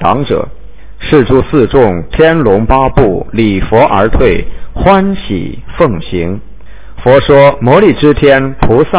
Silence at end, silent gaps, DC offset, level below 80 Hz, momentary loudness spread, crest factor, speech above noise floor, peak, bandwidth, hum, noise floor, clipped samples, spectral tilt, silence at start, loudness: 0 s; none; 7%; -22 dBFS; 11 LU; 8 dB; 24 dB; 0 dBFS; 4 kHz; none; -32 dBFS; 5%; -11 dB/octave; 0 s; -9 LUFS